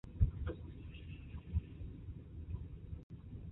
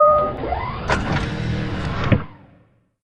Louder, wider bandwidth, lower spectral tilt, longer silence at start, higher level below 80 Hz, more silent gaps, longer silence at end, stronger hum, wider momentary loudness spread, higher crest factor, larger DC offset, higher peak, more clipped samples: second, -45 LUFS vs -22 LUFS; second, 4 kHz vs 10 kHz; first, -9 dB/octave vs -7 dB/octave; about the same, 0.05 s vs 0 s; second, -44 dBFS vs -34 dBFS; first, 3.03-3.10 s vs none; about the same, 0 s vs 0 s; neither; first, 13 LU vs 6 LU; first, 24 dB vs 18 dB; neither; second, -18 dBFS vs -2 dBFS; neither